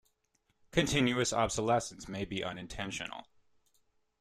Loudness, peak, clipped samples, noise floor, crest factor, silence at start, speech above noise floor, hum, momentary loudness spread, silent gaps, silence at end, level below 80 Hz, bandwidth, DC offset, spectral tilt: -33 LUFS; -12 dBFS; under 0.1%; -77 dBFS; 22 dB; 0.75 s; 44 dB; none; 12 LU; none; 1 s; -56 dBFS; 14 kHz; under 0.1%; -4 dB/octave